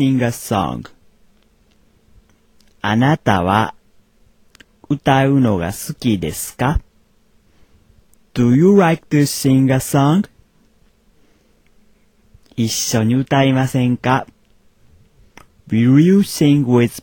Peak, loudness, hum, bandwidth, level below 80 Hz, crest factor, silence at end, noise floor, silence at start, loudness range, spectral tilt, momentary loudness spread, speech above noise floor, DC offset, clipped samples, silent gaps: 0 dBFS; -16 LUFS; none; 18 kHz; -40 dBFS; 16 dB; 0.05 s; -55 dBFS; 0 s; 6 LU; -6 dB/octave; 12 LU; 40 dB; under 0.1%; under 0.1%; none